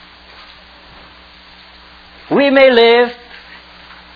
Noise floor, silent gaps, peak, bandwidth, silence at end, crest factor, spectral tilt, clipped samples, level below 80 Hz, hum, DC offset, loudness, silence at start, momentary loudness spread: -41 dBFS; none; 0 dBFS; 5.4 kHz; 1 s; 16 dB; -6 dB/octave; under 0.1%; -50 dBFS; none; under 0.1%; -10 LUFS; 2.3 s; 27 LU